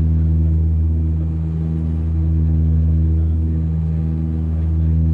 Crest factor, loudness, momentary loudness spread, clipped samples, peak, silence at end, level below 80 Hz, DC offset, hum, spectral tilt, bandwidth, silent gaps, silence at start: 8 dB; -19 LUFS; 4 LU; under 0.1%; -8 dBFS; 0 s; -24 dBFS; under 0.1%; none; -12 dB/octave; 1.9 kHz; none; 0 s